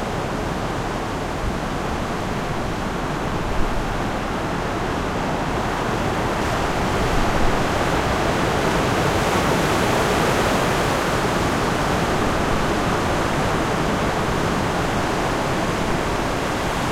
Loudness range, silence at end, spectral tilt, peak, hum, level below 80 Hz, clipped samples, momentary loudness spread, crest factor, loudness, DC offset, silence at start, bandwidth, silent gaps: 5 LU; 0 s; -5 dB/octave; -6 dBFS; none; -32 dBFS; under 0.1%; 6 LU; 16 dB; -21 LUFS; under 0.1%; 0 s; 16.5 kHz; none